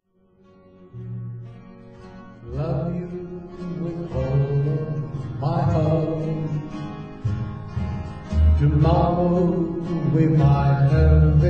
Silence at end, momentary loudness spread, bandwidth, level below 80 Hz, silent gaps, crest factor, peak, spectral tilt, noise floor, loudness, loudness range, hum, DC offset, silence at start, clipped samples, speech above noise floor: 0 s; 17 LU; 6 kHz; -30 dBFS; none; 16 dB; -4 dBFS; -10 dB/octave; -57 dBFS; -22 LUFS; 12 LU; none; under 0.1%; 0.8 s; under 0.1%; 41 dB